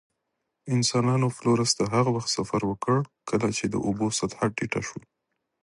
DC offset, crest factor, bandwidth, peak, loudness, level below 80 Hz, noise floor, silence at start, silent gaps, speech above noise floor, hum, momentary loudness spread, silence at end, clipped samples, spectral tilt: under 0.1%; 20 dB; 11.5 kHz; -8 dBFS; -26 LUFS; -56 dBFS; -80 dBFS; 0.65 s; none; 55 dB; none; 7 LU; 0.65 s; under 0.1%; -5 dB/octave